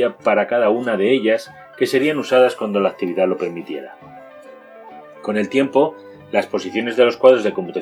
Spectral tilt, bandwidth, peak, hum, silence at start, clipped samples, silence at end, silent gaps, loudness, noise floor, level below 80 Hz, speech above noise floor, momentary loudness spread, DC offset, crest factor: -5.5 dB/octave; 13.5 kHz; 0 dBFS; none; 0 s; under 0.1%; 0 s; none; -18 LUFS; -41 dBFS; -70 dBFS; 23 dB; 12 LU; under 0.1%; 18 dB